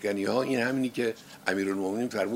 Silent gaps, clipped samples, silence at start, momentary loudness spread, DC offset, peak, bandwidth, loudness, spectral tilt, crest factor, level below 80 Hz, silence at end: none; under 0.1%; 0 s; 5 LU; under 0.1%; -8 dBFS; 16 kHz; -29 LUFS; -5 dB/octave; 20 dB; -74 dBFS; 0 s